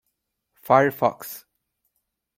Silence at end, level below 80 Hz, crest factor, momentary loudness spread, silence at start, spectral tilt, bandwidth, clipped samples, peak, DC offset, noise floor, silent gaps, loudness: 1 s; -68 dBFS; 24 dB; 19 LU; 0.7 s; -6 dB/octave; 16.5 kHz; under 0.1%; -2 dBFS; under 0.1%; -78 dBFS; none; -21 LUFS